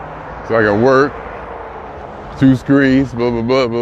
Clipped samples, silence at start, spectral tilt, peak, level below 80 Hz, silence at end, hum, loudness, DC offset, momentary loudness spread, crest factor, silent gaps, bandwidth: under 0.1%; 0 s; -7.5 dB/octave; 0 dBFS; -38 dBFS; 0 s; none; -13 LUFS; under 0.1%; 18 LU; 14 dB; none; 8 kHz